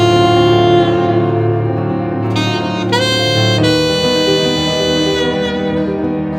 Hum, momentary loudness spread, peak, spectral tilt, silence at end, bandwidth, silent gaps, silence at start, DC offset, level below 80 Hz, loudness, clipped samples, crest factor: none; 7 LU; 0 dBFS; -5.5 dB/octave; 0 s; 16 kHz; none; 0 s; under 0.1%; -38 dBFS; -13 LUFS; under 0.1%; 12 dB